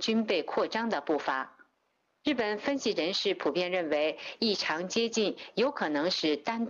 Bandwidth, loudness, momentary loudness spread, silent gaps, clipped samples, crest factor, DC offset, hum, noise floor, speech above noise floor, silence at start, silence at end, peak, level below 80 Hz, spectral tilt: 7.6 kHz; -30 LUFS; 4 LU; none; under 0.1%; 12 dB; under 0.1%; none; -76 dBFS; 46 dB; 0 s; 0 s; -18 dBFS; -74 dBFS; -3.5 dB/octave